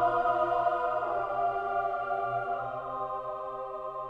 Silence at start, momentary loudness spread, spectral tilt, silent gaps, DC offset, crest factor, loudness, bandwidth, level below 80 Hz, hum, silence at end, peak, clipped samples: 0 s; 10 LU; -7 dB/octave; none; under 0.1%; 14 dB; -31 LUFS; 5.2 kHz; -60 dBFS; none; 0 s; -16 dBFS; under 0.1%